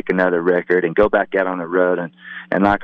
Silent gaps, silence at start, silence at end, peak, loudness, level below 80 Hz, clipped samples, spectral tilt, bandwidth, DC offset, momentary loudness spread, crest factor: none; 0.05 s; 0 s; -4 dBFS; -18 LUFS; -44 dBFS; under 0.1%; -8.5 dB/octave; 5.8 kHz; under 0.1%; 8 LU; 14 dB